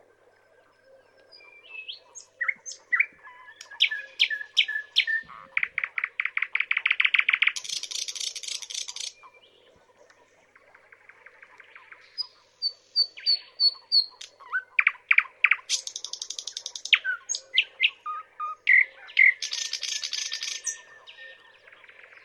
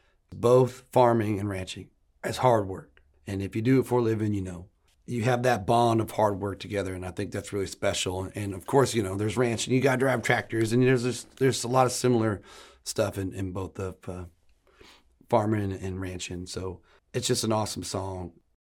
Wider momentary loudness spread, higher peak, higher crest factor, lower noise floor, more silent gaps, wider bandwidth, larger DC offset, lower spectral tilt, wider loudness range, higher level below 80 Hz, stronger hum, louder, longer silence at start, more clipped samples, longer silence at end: first, 17 LU vs 14 LU; first, -4 dBFS vs -8 dBFS; about the same, 24 dB vs 20 dB; about the same, -61 dBFS vs -59 dBFS; neither; second, 14 kHz vs 17.5 kHz; neither; second, 4.5 dB/octave vs -5.5 dB/octave; first, 12 LU vs 7 LU; second, -82 dBFS vs -58 dBFS; neither; about the same, -25 LUFS vs -27 LUFS; first, 1.35 s vs 0.3 s; neither; first, 0.9 s vs 0.3 s